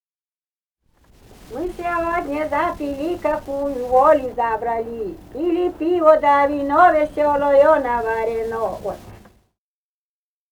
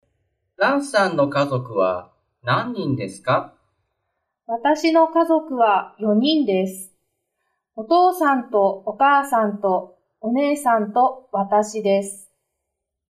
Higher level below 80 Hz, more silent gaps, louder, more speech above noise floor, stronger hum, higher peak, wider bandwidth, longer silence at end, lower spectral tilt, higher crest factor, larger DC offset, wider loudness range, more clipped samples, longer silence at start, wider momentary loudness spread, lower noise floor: first, -46 dBFS vs -68 dBFS; neither; about the same, -19 LUFS vs -20 LUFS; first, over 72 dB vs 61 dB; neither; first, 0 dBFS vs -6 dBFS; first, 19.5 kHz vs 14.5 kHz; first, 1.35 s vs 0.9 s; about the same, -6 dB/octave vs -5.5 dB/octave; about the same, 18 dB vs 14 dB; neither; first, 8 LU vs 3 LU; neither; first, 1.5 s vs 0.6 s; first, 14 LU vs 10 LU; first, under -90 dBFS vs -80 dBFS